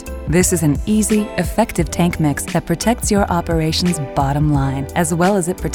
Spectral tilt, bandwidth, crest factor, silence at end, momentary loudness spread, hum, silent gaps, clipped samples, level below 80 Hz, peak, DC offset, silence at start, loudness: -5 dB/octave; 19 kHz; 16 dB; 0 s; 4 LU; none; none; under 0.1%; -30 dBFS; -2 dBFS; under 0.1%; 0 s; -17 LUFS